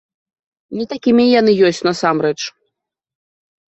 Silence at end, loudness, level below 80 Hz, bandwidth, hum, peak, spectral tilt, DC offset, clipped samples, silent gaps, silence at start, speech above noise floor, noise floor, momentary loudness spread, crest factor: 1.2 s; -15 LUFS; -60 dBFS; 8.2 kHz; none; -2 dBFS; -5 dB/octave; under 0.1%; under 0.1%; none; 0.7 s; 63 dB; -77 dBFS; 14 LU; 16 dB